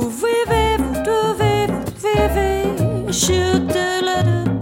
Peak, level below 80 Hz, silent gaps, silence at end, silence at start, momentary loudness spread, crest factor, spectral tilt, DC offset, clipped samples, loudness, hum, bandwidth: -2 dBFS; -30 dBFS; none; 0 s; 0 s; 3 LU; 14 dB; -5 dB/octave; under 0.1%; under 0.1%; -18 LUFS; none; 16.5 kHz